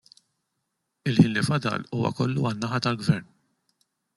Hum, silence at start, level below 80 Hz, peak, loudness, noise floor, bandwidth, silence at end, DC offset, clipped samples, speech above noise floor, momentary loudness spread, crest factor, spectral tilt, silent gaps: none; 1.05 s; -62 dBFS; -2 dBFS; -25 LUFS; -79 dBFS; 12 kHz; 0.95 s; under 0.1%; under 0.1%; 55 dB; 8 LU; 24 dB; -6.5 dB/octave; none